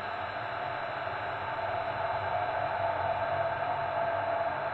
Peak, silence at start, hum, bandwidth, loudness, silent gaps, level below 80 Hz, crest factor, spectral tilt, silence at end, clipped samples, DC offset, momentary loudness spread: -20 dBFS; 0 s; none; 5.6 kHz; -32 LUFS; none; -62 dBFS; 14 dB; -7 dB/octave; 0 s; under 0.1%; under 0.1%; 4 LU